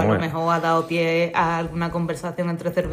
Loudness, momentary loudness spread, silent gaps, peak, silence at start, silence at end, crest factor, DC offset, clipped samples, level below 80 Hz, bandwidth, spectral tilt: -22 LUFS; 6 LU; none; -8 dBFS; 0 s; 0 s; 14 dB; under 0.1%; under 0.1%; -48 dBFS; 15.5 kHz; -6.5 dB/octave